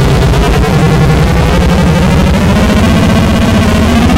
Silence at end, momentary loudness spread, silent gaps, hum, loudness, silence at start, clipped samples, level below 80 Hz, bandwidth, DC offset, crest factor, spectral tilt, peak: 0 s; 1 LU; none; none; -8 LUFS; 0 s; under 0.1%; -14 dBFS; 16 kHz; under 0.1%; 6 dB; -6.5 dB/octave; 0 dBFS